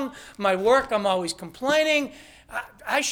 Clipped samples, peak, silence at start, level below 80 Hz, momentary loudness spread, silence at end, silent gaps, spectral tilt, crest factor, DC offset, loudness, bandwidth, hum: under 0.1%; -8 dBFS; 0 s; -58 dBFS; 14 LU; 0 s; none; -3 dB/octave; 16 dB; under 0.1%; -23 LUFS; 18.5 kHz; none